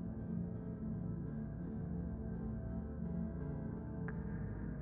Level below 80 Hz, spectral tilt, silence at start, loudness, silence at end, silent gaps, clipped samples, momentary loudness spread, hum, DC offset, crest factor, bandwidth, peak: -50 dBFS; -12 dB/octave; 0 s; -44 LUFS; 0 s; none; under 0.1%; 2 LU; none; under 0.1%; 12 dB; 2.5 kHz; -30 dBFS